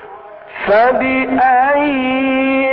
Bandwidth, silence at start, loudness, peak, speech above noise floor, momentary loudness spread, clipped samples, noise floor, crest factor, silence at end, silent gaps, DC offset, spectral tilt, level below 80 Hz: 5.4 kHz; 0 s; -13 LUFS; -4 dBFS; 22 dB; 4 LU; under 0.1%; -34 dBFS; 10 dB; 0 s; none; under 0.1%; -10 dB/octave; -48 dBFS